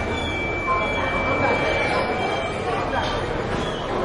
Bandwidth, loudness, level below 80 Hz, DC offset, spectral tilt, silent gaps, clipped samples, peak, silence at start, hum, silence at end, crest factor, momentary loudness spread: 11.5 kHz; -23 LUFS; -38 dBFS; under 0.1%; -5 dB/octave; none; under 0.1%; -10 dBFS; 0 s; none; 0 s; 14 dB; 5 LU